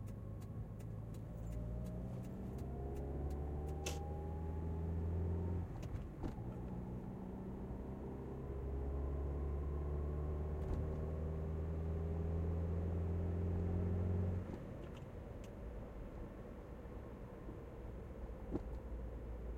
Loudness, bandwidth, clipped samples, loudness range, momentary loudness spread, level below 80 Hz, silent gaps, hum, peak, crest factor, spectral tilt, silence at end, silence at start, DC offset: -45 LUFS; 10 kHz; under 0.1%; 9 LU; 11 LU; -48 dBFS; none; none; -26 dBFS; 16 dB; -8 dB/octave; 0 s; 0 s; under 0.1%